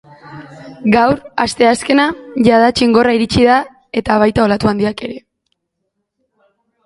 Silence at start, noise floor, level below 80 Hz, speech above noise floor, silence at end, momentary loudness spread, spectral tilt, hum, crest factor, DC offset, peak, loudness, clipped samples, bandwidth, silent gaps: 0.25 s; -72 dBFS; -40 dBFS; 60 dB; 1.7 s; 12 LU; -5.5 dB/octave; none; 14 dB; under 0.1%; 0 dBFS; -13 LUFS; under 0.1%; 11.5 kHz; none